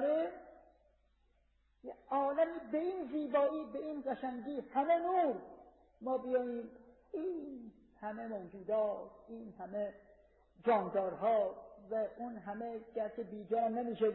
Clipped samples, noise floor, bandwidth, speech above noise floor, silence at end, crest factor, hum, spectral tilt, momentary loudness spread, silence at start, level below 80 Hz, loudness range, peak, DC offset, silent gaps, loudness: under 0.1%; -74 dBFS; 4 kHz; 37 dB; 0 s; 16 dB; none; -5 dB/octave; 16 LU; 0 s; -74 dBFS; 6 LU; -22 dBFS; under 0.1%; none; -37 LUFS